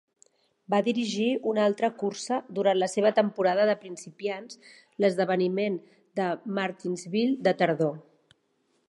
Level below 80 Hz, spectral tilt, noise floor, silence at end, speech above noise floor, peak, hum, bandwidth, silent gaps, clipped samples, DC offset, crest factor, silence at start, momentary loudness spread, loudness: -80 dBFS; -5.5 dB/octave; -72 dBFS; 0.9 s; 45 dB; -8 dBFS; none; 11.5 kHz; none; under 0.1%; under 0.1%; 20 dB; 0.7 s; 12 LU; -27 LUFS